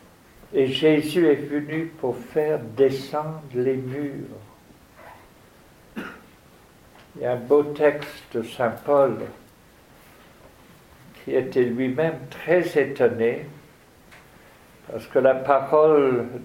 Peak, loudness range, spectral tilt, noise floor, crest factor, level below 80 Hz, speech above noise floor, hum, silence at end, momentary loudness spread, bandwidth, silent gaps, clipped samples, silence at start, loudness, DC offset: -2 dBFS; 9 LU; -6.5 dB/octave; -52 dBFS; 22 dB; -60 dBFS; 30 dB; none; 0 s; 18 LU; 16.5 kHz; none; under 0.1%; 0.5 s; -22 LUFS; under 0.1%